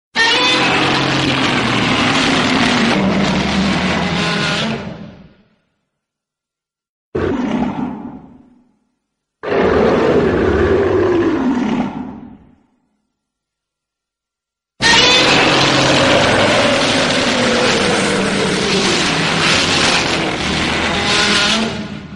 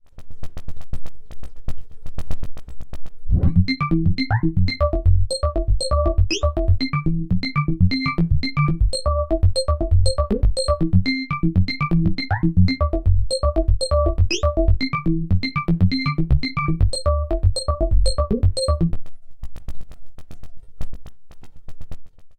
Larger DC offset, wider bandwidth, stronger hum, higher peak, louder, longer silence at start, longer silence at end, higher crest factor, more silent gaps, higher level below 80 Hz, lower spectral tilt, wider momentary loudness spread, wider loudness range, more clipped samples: neither; first, 11.5 kHz vs 9 kHz; neither; first, 0 dBFS vs -4 dBFS; first, -13 LUFS vs -21 LUFS; about the same, 0.15 s vs 0.15 s; about the same, 0 s vs 0.05 s; about the same, 16 dB vs 14 dB; first, 6.89-7.12 s vs none; second, -38 dBFS vs -24 dBFS; second, -3.5 dB/octave vs -6 dB/octave; second, 10 LU vs 19 LU; first, 13 LU vs 5 LU; neither